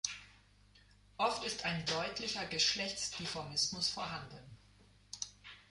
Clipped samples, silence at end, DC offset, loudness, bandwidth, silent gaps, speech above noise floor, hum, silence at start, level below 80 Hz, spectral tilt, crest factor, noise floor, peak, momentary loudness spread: under 0.1%; 0.1 s; under 0.1%; -36 LUFS; 11.5 kHz; none; 27 dB; 50 Hz at -60 dBFS; 0.05 s; -66 dBFS; -2 dB/octave; 22 dB; -65 dBFS; -18 dBFS; 20 LU